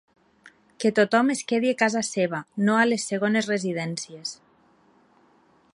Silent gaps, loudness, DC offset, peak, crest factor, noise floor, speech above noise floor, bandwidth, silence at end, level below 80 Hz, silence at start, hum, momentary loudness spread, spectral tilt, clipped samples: none; -24 LUFS; under 0.1%; -6 dBFS; 18 dB; -60 dBFS; 37 dB; 11.5 kHz; 1.4 s; -74 dBFS; 0.8 s; none; 11 LU; -4.5 dB/octave; under 0.1%